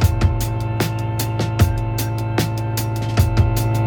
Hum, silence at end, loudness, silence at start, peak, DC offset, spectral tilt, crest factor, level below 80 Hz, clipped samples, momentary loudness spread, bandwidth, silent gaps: none; 0 s; -20 LUFS; 0 s; -2 dBFS; under 0.1%; -6 dB/octave; 16 dB; -28 dBFS; under 0.1%; 5 LU; over 20 kHz; none